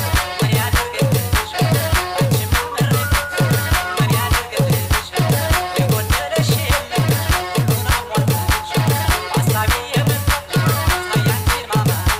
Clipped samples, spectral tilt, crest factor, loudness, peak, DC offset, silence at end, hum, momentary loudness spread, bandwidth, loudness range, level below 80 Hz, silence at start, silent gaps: under 0.1%; -4.5 dB/octave; 8 dB; -17 LUFS; -8 dBFS; under 0.1%; 0 s; none; 2 LU; 16.5 kHz; 0 LU; -26 dBFS; 0 s; none